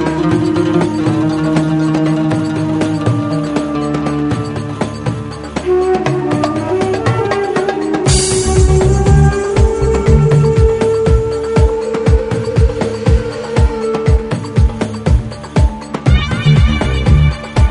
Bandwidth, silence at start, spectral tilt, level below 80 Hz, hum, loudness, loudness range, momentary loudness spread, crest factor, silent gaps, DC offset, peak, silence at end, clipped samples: 10.5 kHz; 0 s; -6.5 dB/octave; -18 dBFS; none; -14 LUFS; 5 LU; 6 LU; 12 dB; none; under 0.1%; 0 dBFS; 0 s; under 0.1%